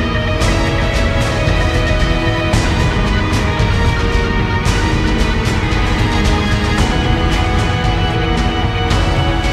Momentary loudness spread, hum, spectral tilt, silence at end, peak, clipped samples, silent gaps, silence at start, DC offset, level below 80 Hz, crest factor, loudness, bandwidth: 1 LU; none; -5.5 dB/octave; 0 s; 0 dBFS; under 0.1%; none; 0 s; under 0.1%; -18 dBFS; 12 dB; -15 LUFS; 13.5 kHz